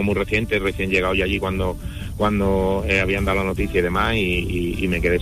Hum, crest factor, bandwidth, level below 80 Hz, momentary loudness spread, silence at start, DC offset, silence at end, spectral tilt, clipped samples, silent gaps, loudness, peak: none; 14 dB; 15 kHz; -30 dBFS; 5 LU; 0 s; under 0.1%; 0 s; -6 dB/octave; under 0.1%; none; -21 LUFS; -8 dBFS